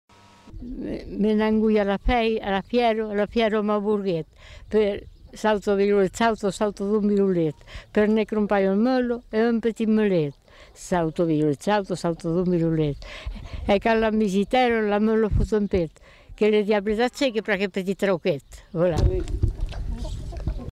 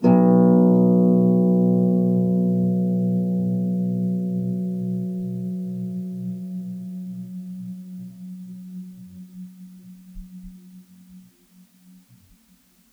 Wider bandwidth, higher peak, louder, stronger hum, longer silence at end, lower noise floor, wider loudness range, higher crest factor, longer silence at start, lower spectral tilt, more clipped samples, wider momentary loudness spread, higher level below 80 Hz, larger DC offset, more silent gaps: first, 12.5 kHz vs 2.7 kHz; second, -8 dBFS vs -4 dBFS; second, -23 LUFS vs -20 LUFS; neither; second, 0 s vs 1.7 s; second, -44 dBFS vs -58 dBFS; second, 2 LU vs 23 LU; about the same, 14 dB vs 16 dB; first, 0.45 s vs 0 s; second, -6.5 dB/octave vs -11.5 dB/octave; neither; second, 12 LU vs 24 LU; first, -36 dBFS vs -56 dBFS; neither; neither